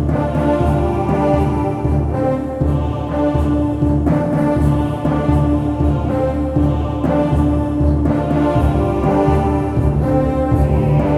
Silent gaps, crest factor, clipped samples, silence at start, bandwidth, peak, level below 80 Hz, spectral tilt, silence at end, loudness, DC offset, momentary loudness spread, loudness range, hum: none; 14 dB; under 0.1%; 0 s; 11.5 kHz; -2 dBFS; -22 dBFS; -9.5 dB/octave; 0 s; -16 LUFS; under 0.1%; 3 LU; 1 LU; none